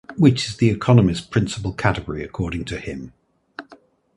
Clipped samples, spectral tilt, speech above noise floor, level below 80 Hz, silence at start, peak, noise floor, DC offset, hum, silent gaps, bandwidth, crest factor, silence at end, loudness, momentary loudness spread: under 0.1%; -6.5 dB/octave; 31 dB; -40 dBFS; 0.1 s; 0 dBFS; -51 dBFS; under 0.1%; none; none; 11.5 kHz; 20 dB; 0.55 s; -20 LUFS; 23 LU